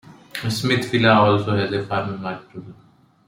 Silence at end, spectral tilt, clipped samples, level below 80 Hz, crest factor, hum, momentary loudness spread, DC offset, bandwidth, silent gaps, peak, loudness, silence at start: 0.55 s; -6 dB/octave; under 0.1%; -58 dBFS; 18 dB; none; 19 LU; under 0.1%; 16.5 kHz; none; -4 dBFS; -20 LUFS; 0.1 s